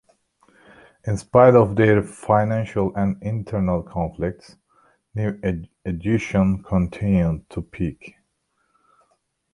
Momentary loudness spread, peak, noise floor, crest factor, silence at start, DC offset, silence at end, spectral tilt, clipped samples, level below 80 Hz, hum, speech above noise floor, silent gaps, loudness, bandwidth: 14 LU; -2 dBFS; -70 dBFS; 20 dB; 1.05 s; under 0.1%; 1.45 s; -8.5 dB/octave; under 0.1%; -42 dBFS; none; 50 dB; none; -21 LUFS; 11.5 kHz